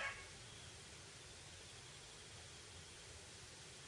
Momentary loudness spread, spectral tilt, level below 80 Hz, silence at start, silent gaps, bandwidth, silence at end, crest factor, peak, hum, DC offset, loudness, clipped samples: 1 LU; -2 dB/octave; -72 dBFS; 0 s; none; 11.5 kHz; 0 s; 22 dB; -32 dBFS; none; under 0.1%; -54 LUFS; under 0.1%